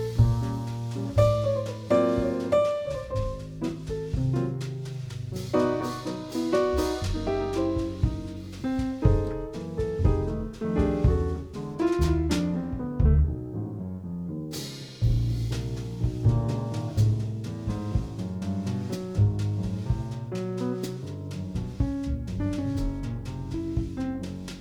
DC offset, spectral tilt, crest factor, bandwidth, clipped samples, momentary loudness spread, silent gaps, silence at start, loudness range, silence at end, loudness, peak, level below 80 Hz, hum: under 0.1%; -7.5 dB/octave; 20 dB; 16.5 kHz; under 0.1%; 10 LU; none; 0 s; 5 LU; 0 s; -28 LUFS; -8 dBFS; -36 dBFS; none